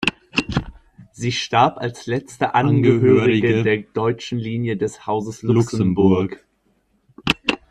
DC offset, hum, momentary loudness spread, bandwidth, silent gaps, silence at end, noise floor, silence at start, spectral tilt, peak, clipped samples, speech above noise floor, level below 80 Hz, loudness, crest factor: under 0.1%; none; 11 LU; 12 kHz; none; 0.15 s; -63 dBFS; 0 s; -6 dB/octave; 0 dBFS; under 0.1%; 45 dB; -46 dBFS; -19 LUFS; 20 dB